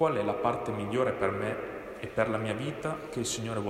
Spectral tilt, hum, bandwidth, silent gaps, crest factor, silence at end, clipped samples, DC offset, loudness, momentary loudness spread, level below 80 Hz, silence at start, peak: -5 dB/octave; none; 16 kHz; none; 18 dB; 0 s; under 0.1%; under 0.1%; -32 LUFS; 7 LU; -58 dBFS; 0 s; -12 dBFS